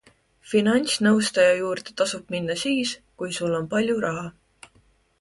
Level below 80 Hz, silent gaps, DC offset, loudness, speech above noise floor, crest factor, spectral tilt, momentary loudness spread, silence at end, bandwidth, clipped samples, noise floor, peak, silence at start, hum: -62 dBFS; none; under 0.1%; -23 LUFS; 38 dB; 18 dB; -4 dB/octave; 10 LU; 0.9 s; 11.5 kHz; under 0.1%; -61 dBFS; -6 dBFS; 0.45 s; none